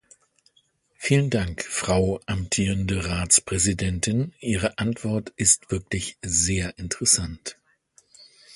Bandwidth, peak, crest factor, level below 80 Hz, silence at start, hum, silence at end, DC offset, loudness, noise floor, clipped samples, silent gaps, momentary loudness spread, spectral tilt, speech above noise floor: 11.5 kHz; -4 dBFS; 22 dB; -40 dBFS; 1 s; none; 0.05 s; under 0.1%; -23 LUFS; -65 dBFS; under 0.1%; none; 10 LU; -3.5 dB/octave; 42 dB